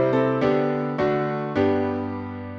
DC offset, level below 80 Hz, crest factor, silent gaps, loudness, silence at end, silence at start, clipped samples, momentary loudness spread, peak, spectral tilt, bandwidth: under 0.1%; -56 dBFS; 14 dB; none; -23 LUFS; 0 s; 0 s; under 0.1%; 8 LU; -8 dBFS; -8.5 dB/octave; 6.8 kHz